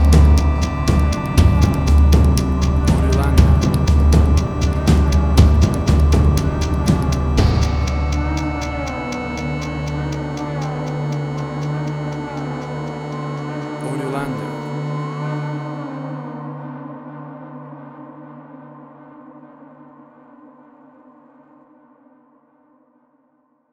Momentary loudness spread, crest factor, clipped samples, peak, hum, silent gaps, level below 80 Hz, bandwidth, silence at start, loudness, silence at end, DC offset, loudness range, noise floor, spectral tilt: 19 LU; 18 dB; under 0.1%; 0 dBFS; none; none; -20 dBFS; 13 kHz; 0 s; -18 LUFS; 4.25 s; under 0.1%; 17 LU; -61 dBFS; -7 dB/octave